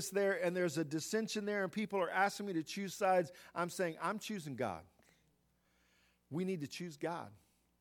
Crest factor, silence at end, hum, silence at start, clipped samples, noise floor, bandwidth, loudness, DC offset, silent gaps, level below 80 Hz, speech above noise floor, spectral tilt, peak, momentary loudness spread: 20 dB; 0.45 s; 60 Hz at -70 dBFS; 0 s; under 0.1%; -76 dBFS; 18 kHz; -38 LUFS; under 0.1%; none; -80 dBFS; 38 dB; -4.5 dB/octave; -20 dBFS; 10 LU